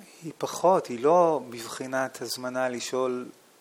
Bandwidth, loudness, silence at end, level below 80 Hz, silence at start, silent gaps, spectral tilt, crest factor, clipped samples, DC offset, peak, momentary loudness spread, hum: 18 kHz; -27 LUFS; 0.3 s; -78 dBFS; 0 s; none; -4 dB/octave; 18 dB; under 0.1%; under 0.1%; -10 dBFS; 14 LU; none